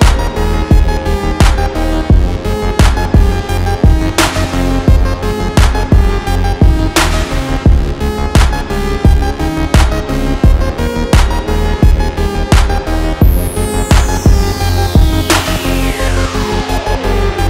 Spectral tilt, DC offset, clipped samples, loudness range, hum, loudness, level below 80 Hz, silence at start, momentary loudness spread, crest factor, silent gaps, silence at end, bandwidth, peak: -5.5 dB/octave; under 0.1%; under 0.1%; 1 LU; none; -13 LUFS; -12 dBFS; 0 s; 5 LU; 10 dB; none; 0 s; 16 kHz; 0 dBFS